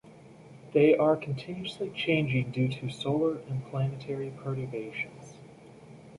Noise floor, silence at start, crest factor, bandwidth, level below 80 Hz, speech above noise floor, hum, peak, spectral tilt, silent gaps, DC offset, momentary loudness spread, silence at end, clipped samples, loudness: -52 dBFS; 0.05 s; 18 dB; 11.5 kHz; -64 dBFS; 23 dB; none; -12 dBFS; -7.5 dB/octave; none; under 0.1%; 13 LU; 0 s; under 0.1%; -29 LUFS